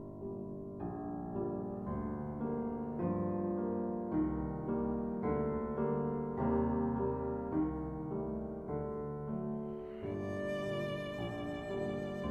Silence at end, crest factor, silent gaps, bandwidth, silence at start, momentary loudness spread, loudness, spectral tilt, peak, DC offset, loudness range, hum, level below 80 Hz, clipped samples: 0 s; 16 dB; none; 8.8 kHz; 0 s; 7 LU; -38 LUFS; -9 dB/octave; -22 dBFS; under 0.1%; 4 LU; none; -52 dBFS; under 0.1%